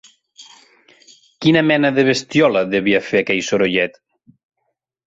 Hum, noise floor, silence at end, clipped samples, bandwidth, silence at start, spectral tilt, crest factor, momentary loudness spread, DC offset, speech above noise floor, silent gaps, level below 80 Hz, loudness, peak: none; -74 dBFS; 1.2 s; under 0.1%; 8 kHz; 0.4 s; -5 dB/octave; 16 dB; 5 LU; under 0.1%; 58 dB; none; -58 dBFS; -16 LUFS; -2 dBFS